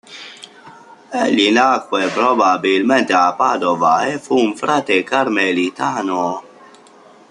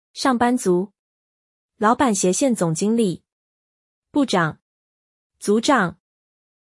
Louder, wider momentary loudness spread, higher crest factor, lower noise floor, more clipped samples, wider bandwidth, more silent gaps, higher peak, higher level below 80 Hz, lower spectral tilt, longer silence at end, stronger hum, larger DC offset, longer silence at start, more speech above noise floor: first, -16 LUFS vs -20 LUFS; about the same, 8 LU vs 8 LU; about the same, 16 dB vs 16 dB; second, -45 dBFS vs under -90 dBFS; neither; about the same, 11 kHz vs 12 kHz; second, none vs 0.99-1.69 s, 3.32-4.02 s, 4.62-5.30 s; first, -2 dBFS vs -6 dBFS; about the same, -64 dBFS vs -60 dBFS; about the same, -4 dB/octave vs -4.5 dB/octave; first, 0.9 s vs 0.75 s; neither; neither; about the same, 0.1 s vs 0.15 s; second, 29 dB vs over 71 dB